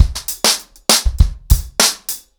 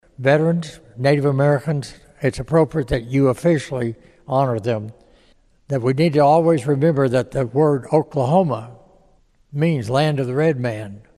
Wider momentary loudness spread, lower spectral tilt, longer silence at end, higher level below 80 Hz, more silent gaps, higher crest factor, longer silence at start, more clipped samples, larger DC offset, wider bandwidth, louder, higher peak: second, 6 LU vs 10 LU; second, -2 dB/octave vs -7.5 dB/octave; about the same, 0.2 s vs 0.2 s; first, -20 dBFS vs -44 dBFS; neither; about the same, 16 dB vs 16 dB; second, 0 s vs 0.2 s; first, 0.5% vs under 0.1%; neither; first, over 20 kHz vs 12.5 kHz; first, -15 LUFS vs -19 LUFS; about the same, 0 dBFS vs -2 dBFS